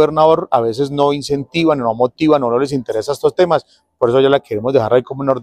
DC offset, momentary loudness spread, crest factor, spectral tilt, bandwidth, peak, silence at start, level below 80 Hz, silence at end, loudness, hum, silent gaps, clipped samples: under 0.1%; 7 LU; 14 dB; -6.5 dB/octave; 14.5 kHz; 0 dBFS; 0 s; -52 dBFS; 0 s; -15 LUFS; none; none; under 0.1%